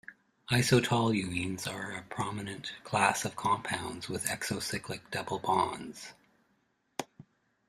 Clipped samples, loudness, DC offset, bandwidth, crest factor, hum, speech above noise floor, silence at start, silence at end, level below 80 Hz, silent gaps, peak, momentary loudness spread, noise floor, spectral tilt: under 0.1%; -32 LUFS; under 0.1%; 15.5 kHz; 24 dB; none; 42 dB; 0.1 s; 0.45 s; -64 dBFS; none; -10 dBFS; 16 LU; -74 dBFS; -4 dB/octave